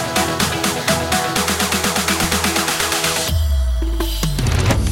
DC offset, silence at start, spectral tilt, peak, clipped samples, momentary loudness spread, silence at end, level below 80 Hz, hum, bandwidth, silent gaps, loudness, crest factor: under 0.1%; 0 s; -3.5 dB/octave; -2 dBFS; under 0.1%; 4 LU; 0 s; -24 dBFS; none; 16.5 kHz; none; -17 LUFS; 16 dB